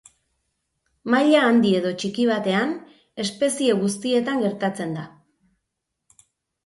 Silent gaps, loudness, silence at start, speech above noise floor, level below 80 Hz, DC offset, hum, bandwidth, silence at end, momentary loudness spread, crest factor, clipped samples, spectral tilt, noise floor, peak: none; -21 LUFS; 1.05 s; 59 dB; -68 dBFS; under 0.1%; none; 11.5 kHz; 1.6 s; 16 LU; 20 dB; under 0.1%; -5 dB/octave; -80 dBFS; -4 dBFS